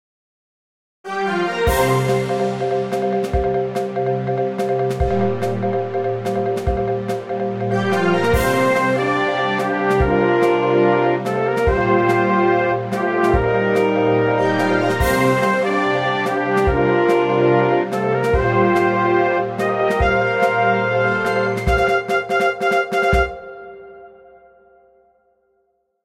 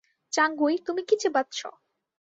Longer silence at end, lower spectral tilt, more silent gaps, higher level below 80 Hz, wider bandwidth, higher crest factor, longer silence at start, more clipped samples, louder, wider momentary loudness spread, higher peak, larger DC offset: first, 1.95 s vs 0.55 s; first, -6.5 dB/octave vs -1 dB/octave; neither; first, -32 dBFS vs -78 dBFS; first, 16 kHz vs 8.2 kHz; about the same, 14 dB vs 18 dB; first, 1.05 s vs 0.3 s; neither; first, -18 LUFS vs -26 LUFS; second, 6 LU vs 11 LU; first, -4 dBFS vs -10 dBFS; neither